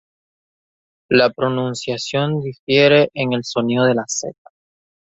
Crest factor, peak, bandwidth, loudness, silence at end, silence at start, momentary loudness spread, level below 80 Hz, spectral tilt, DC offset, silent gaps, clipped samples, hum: 18 dB; -2 dBFS; 8.2 kHz; -17 LUFS; 0.8 s; 1.1 s; 11 LU; -58 dBFS; -4.5 dB/octave; under 0.1%; 2.59-2.67 s; under 0.1%; none